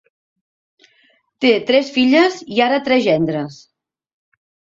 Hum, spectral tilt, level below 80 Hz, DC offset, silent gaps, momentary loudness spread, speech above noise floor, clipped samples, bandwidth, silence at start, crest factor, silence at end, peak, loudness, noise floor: none; -5.5 dB/octave; -60 dBFS; under 0.1%; none; 7 LU; 43 dB; under 0.1%; 7.6 kHz; 1.4 s; 16 dB; 1.25 s; -2 dBFS; -16 LUFS; -58 dBFS